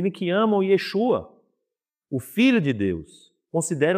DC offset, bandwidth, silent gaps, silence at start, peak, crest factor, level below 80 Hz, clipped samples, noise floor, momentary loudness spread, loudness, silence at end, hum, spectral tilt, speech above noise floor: under 0.1%; 15.5 kHz; none; 0 s; -8 dBFS; 16 dB; -62 dBFS; under 0.1%; -85 dBFS; 11 LU; -23 LUFS; 0 s; none; -5.5 dB/octave; 63 dB